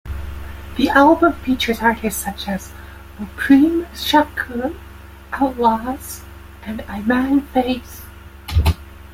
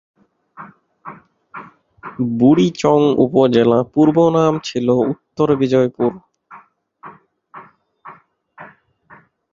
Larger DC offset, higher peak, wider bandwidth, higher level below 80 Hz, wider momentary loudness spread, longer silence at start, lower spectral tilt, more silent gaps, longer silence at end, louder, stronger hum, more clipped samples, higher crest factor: neither; about the same, -2 dBFS vs -2 dBFS; first, 16.5 kHz vs 7.6 kHz; first, -34 dBFS vs -56 dBFS; about the same, 22 LU vs 24 LU; second, 0.05 s vs 0.6 s; second, -5.5 dB/octave vs -7.5 dB/octave; neither; second, 0 s vs 0.9 s; second, -18 LUFS vs -15 LUFS; neither; neither; about the same, 18 dB vs 16 dB